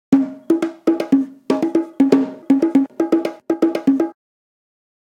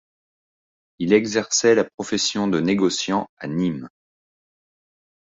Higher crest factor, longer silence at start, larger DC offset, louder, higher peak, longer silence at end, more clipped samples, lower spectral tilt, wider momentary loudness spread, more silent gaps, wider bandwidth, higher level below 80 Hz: about the same, 18 dB vs 20 dB; second, 0.1 s vs 1 s; neither; first, -18 LUFS vs -21 LUFS; first, 0 dBFS vs -4 dBFS; second, 0.95 s vs 1.35 s; neither; first, -7 dB/octave vs -4 dB/octave; second, 5 LU vs 8 LU; second, none vs 1.94-1.98 s, 3.29-3.37 s; first, 9.4 kHz vs 8 kHz; about the same, -64 dBFS vs -60 dBFS